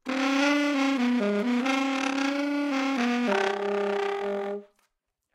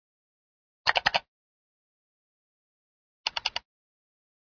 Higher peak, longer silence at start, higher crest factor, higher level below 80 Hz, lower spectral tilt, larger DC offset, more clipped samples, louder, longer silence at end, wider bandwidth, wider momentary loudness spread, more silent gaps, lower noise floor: second, -12 dBFS vs -4 dBFS; second, 0.05 s vs 0.85 s; second, 16 dB vs 32 dB; second, -76 dBFS vs -66 dBFS; first, -4 dB/octave vs -0.5 dB/octave; neither; neither; about the same, -26 LUFS vs -28 LUFS; second, 0.7 s vs 0.95 s; first, 15 kHz vs 5.4 kHz; second, 6 LU vs 9 LU; second, none vs 1.28-3.24 s; second, -77 dBFS vs under -90 dBFS